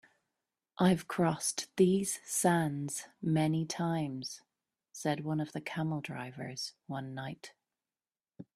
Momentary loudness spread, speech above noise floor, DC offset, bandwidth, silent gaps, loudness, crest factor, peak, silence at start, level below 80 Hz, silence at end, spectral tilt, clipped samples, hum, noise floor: 14 LU; over 57 dB; under 0.1%; 15 kHz; none; -33 LUFS; 20 dB; -14 dBFS; 0.8 s; -72 dBFS; 0.15 s; -5 dB/octave; under 0.1%; none; under -90 dBFS